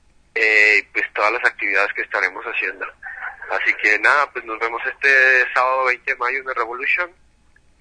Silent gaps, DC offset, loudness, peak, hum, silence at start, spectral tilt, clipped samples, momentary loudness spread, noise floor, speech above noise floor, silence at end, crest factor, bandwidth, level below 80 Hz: none; under 0.1%; -17 LUFS; 0 dBFS; none; 0.35 s; -1.5 dB/octave; under 0.1%; 13 LU; -54 dBFS; 35 dB; 0.75 s; 20 dB; 10 kHz; -58 dBFS